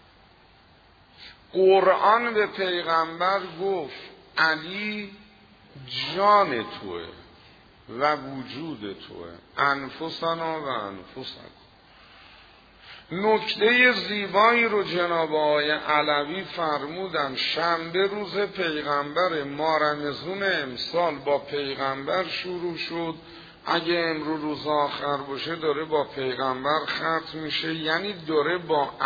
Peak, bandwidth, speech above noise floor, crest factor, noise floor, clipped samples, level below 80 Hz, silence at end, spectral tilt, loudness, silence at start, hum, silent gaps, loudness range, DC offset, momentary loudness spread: -6 dBFS; 5 kHz; 30 dB; 20 dB; -55 dBFS; under 0.1%; -62 dBFS; 0 s; -5.5 dB/octave; -25 LUFS; 1.2 s; none; none; 8 LU; under 0.1%; 16 LU